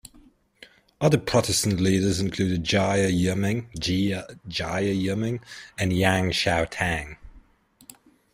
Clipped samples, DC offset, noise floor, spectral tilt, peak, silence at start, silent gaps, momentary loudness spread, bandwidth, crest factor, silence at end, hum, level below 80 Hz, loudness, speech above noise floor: under 0.1%; under 0.1%; -58 dBFS; -5 dB/octave; -6 dBFS; 0.05 s; none; 9 LU; 16 kHz; 20 dB; 0.95 s; none; -48 dBFS; -24 LUFS; 34 dB